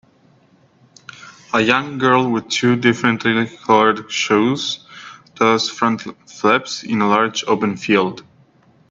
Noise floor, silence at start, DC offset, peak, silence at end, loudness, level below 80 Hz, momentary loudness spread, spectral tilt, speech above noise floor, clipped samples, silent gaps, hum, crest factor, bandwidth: -54 dBFS; 1.2 s; under 0.1%; 0 dBFS; 0.7 s; -17 LUFS; -62 dBFS; 13 LU; -4.5 dB/octave; 37 dB; under 0.1%; none; none; 18 dB; 7.8 kHz